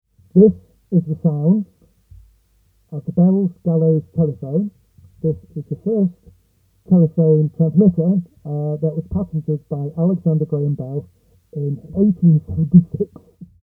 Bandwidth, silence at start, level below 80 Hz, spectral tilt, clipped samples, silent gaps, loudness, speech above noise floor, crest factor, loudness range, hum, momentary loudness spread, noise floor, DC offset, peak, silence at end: 1.3 kHz; 0.35 s; -48 dBFS; -14.5 dB/octave; under 0.1%; none; -18 LUFS; 42 dB; 18 dB; 4 LU; none; 13 LU; -59 dBFS; under 0.1%; 0 dBFS; 0.2 s